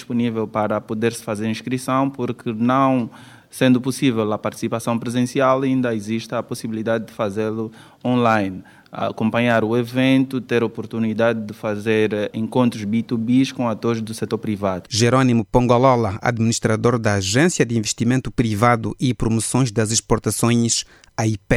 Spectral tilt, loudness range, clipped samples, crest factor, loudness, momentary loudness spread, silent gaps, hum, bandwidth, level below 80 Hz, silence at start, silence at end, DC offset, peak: -5.5 dB/octave; 4 LU; under 0.1%; 18 dB; -20 LUFS; 8 LU; none; none; 15 kHz; -44 dBFS; 0 s; 0 s; under 0.1%; 0 dBFS